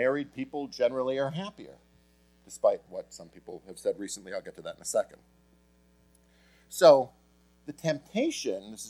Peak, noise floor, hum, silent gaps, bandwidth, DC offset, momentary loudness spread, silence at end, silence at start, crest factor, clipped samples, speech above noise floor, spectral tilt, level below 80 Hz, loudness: -6 dBFS; -63 dBFS; none; none; 15 kHz; under 0.1%; 24 LU; 0 s; 0 s; 24 dB; under 0.1%; 34 dB; -4.5 dB/octave; -68 dBFS; -29 LUFS